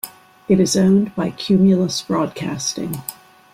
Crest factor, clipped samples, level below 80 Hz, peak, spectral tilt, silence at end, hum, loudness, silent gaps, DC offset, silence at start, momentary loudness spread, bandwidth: 14 dB; under 0.1%; -52 dBFS; -4 dBFS; -5.5 dB/octave; 0.4 s; none; -18 LUFS; none; under 0.1%; 0.05 s; 15 LU; 16 kHz